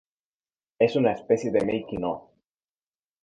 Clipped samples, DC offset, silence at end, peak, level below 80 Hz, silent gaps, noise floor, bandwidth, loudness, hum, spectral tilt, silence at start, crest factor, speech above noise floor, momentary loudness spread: under 0.1%; under 0.1%; 1.05 s; -8 dBFS; -60 dBFS; none; under -90 dBFS; 9.4 kHz; -25 LUFS; none; -6.5 dB/octave; 0.8 s; 20 dB; over 66 dB; 9 LU